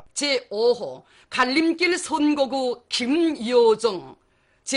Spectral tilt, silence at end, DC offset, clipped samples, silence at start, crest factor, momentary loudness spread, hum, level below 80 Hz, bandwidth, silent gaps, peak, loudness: -2.5 dB/octave; 0 s; under 0.1%; under 0.1%; 0.15 s; 16 dB; 9 LU; none; -64 dBFS; 11 kHz; none; -8 dBFS; -22 LUFS